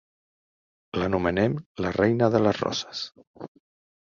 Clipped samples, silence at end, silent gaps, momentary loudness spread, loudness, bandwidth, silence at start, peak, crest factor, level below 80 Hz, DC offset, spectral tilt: under 0.1%; 0.7 s; 1.66-1.75 s, 3.27-3.34 s; 23 LU; -25 LUFS; 7.4 kHz; 0.95 s; -6 dBFS; 20 dB; -52 dBFS; under 0.1%; -6 dB/octave